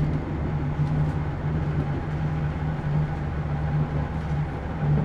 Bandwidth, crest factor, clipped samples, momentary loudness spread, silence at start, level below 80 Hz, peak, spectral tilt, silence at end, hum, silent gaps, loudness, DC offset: 5.6 kHz; 12 dB; under 0.1%; 3 LU; 0 s; -34 dBFS; -12 dBFS; -9.5 dB/octave; 0 s; none; none; -27 LUFS; under 0.1%